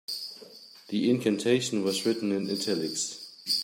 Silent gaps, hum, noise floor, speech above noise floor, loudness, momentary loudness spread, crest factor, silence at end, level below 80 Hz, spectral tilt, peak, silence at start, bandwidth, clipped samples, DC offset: none; none; -50 dBFS; 22 dB; -28 LUFS; 14 LU; 18 dB; 0 s; -74 dBFS; -4 dB/octave; -10 dBFS; 0.1 s; 16.5 kHz; under 0.1%; under 0.1%